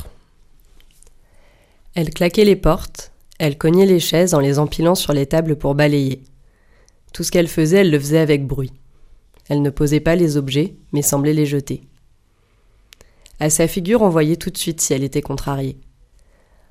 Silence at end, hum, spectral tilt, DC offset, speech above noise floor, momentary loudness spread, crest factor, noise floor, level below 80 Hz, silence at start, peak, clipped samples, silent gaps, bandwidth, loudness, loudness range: 0.95 s; none; -5.5 dB/octave; under 0.1%; 40 dB; 11 LU; 16 dB; -56 dBFS; -36 dBFS; 0 s; -2 dBFS; under 0.1%; none; 15.5 kHz; -17 LUFS; 4 LU